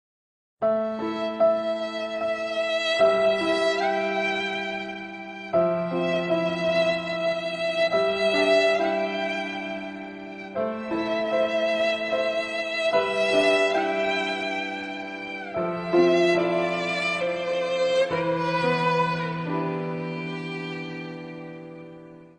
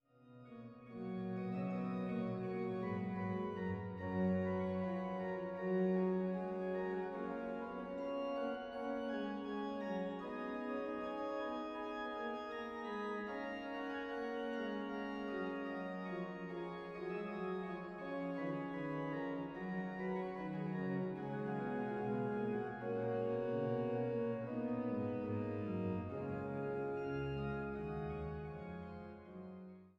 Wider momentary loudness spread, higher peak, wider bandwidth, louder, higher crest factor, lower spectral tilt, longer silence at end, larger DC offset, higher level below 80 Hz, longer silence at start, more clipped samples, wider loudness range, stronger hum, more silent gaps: first, 13 LU vs 7 LU; first, -8 dBFS vs -28 dBFS; first, 10 kHz vs 7 kHz; first, -24 LUFS vs -42 LUFS; about the same, 16 dB vs 14 dB; second, -5 dB/octave vs -9 dB/octave; about the same, 0.1 s vs 0.1 s; neither; about the same, -64 dBFS vs -66 dBFS; first, 0.6 s vs 0.2 s; neither; about the same, 3 LU vs 4 LU; neither; neither